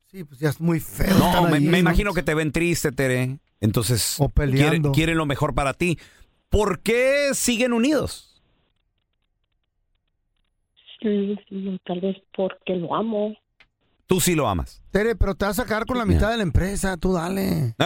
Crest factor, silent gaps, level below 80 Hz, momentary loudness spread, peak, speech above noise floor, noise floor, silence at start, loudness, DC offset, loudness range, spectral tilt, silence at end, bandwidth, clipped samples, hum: 20 dB; none; -34 dBFS; 9 LU; -4 dBFS; 51 dB; -72 dBFS; 0.15 s; -22 LUFS; under 0.1%; 10 LU; -5 dB/octave; 0 s; 17 kHz; under 0.1%; none